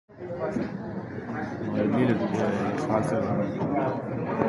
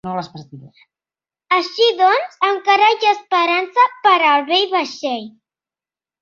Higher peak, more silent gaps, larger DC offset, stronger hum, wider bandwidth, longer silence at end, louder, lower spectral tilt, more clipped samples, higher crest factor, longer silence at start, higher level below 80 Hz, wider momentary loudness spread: second, -10 dBFS vs -2 dBFS; neither; neither; neither; first, 11.5 kHz vs 7.4 kHz; second, 0 s vs 0.9 s; second, -28 LUFS vs -15 LUFS; first, -8 dB/octave vs -3.5 dB/octave; neither; about the same, 18 dB vs 16 dB; about the same, 0.1 s vs 0.05 s; first, -56 dBFS vs -68 dBFS; about the same, 10 LU vs 11 LU